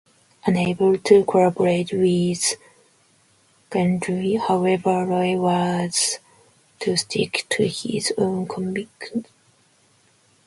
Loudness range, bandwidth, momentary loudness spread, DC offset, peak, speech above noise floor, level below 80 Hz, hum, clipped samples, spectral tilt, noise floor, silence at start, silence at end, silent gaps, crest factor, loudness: 5 LU; 11.5 kHz; 10 LU; under 0.1%; -2 dBFS; 39 dB; -60 dBFS; none; under 0.1%; -4.5 dB/octave; -59 dBFS; 0.45 s; 1.25 s; none; 20 dB; -21 LUFS